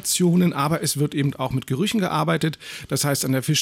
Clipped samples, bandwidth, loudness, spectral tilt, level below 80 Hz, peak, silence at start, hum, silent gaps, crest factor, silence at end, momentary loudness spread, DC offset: under 0.1%; 17 kHz; -22 LUFS; -4.5 dB/octave; -56 dBFS; -8 dBFS; 0 s; none; none; 12 dB; 0 s; 8 LU; under 0.1%